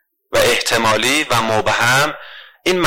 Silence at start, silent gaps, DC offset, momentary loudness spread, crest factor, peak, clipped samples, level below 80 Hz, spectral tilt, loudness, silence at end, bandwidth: 0.3 s; none; under 0.1%; 7 LU; 12 dB; -4 dBFS; under 0.1%; -46 dBFS; -3 dB/octave; -15 LUFS; 0 s; 17 kHz